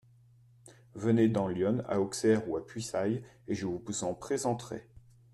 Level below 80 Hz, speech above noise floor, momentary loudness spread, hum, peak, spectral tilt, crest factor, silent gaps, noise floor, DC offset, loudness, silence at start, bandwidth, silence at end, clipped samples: -64 dBFS; 30 dB; 11 LU; none; -14 dBFS; -6 dB/octave; 18 dB; none; -61 dBFS; under 0.1%; -32 LUFS; 0.65 s; 12.5 kHz; 0.35 s; under 0.1%